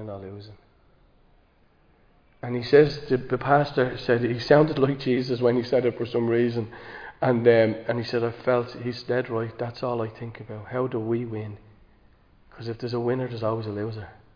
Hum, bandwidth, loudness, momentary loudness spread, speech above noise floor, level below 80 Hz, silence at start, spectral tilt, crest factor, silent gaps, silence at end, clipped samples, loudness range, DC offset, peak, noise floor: none; 5.2 kHz; -24 LUFS; 18 LU; 36 dB; -56 dBFS; 0 s; -8 dB/octave; 22 dB; none; 0.25 s; under 0.1%; 9 LU; under 0.1%; -4 dBFS; -60 dBFS